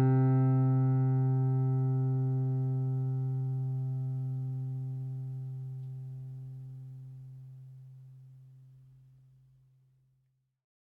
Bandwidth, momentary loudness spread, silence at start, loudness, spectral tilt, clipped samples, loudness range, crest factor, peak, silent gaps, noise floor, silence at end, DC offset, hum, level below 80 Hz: 2.2 kHz; 22 LU; 0 s; -31 LUFS; -12.5 dB/octave; under 0.1%; 21 LU; 14 dB; -18 dBFS; none; -76 dBFS; 2.25 s; under 0.1%; none; -70 dBFS